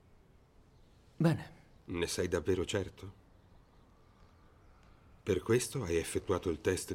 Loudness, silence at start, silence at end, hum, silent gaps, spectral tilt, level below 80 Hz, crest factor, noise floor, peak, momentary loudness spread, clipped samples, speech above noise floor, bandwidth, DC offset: -35 LUFS; 1.2 s; 0 s; none; none; -5 dB/octave; -60 dBFS; 20 dB; -63 dBFS; -18 dBFS; 14 LU; under 0.1%; 29 dB; 16.5 kHz; under 0.1%